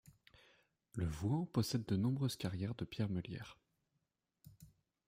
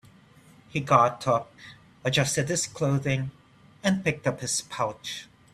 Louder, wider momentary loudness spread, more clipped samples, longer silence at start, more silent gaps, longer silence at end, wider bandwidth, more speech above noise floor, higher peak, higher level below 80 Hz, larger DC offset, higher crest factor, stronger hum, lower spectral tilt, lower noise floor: second, -40 LUFS vs -26 LUFS; about the same, 12 LU vs 14 LU; neither; first, 0.95 s vs 0.75 s; neither; about the same, 0.4 s vs 0.3 s; first, 16 kHz vs 14.5 kHz; first, 47 dB vs 29 dB; second, -22 dBFS vs -4 dBFS; about the same, -64 dBFS vs -60 dBFS; neither; about the same, 20 dB vs 22 dB; neither; first, -6.5 dB/octave vs -4 dB/octave; first, -86 dBFS vs -55 dBFS